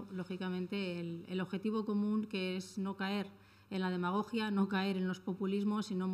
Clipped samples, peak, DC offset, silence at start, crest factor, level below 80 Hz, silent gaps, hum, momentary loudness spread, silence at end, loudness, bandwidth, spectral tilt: under 0.1%; -22 dBFS; under 0.1%; 0 s; 14 dB; -80 dBFS; none; none; 7 LU; 0 s; -37 LUFS; 12.5 kHz; -6.5 dB/octave